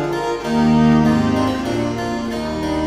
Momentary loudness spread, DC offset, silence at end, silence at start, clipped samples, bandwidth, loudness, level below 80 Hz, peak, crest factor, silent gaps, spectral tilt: 9 LU; under 0.1%; 0 s; 0 s; under 0.1%; 13 kHz; -18 LUFS; -36 dBFS; -4 dBFS; 14 dB; none; -6.5 dB/octave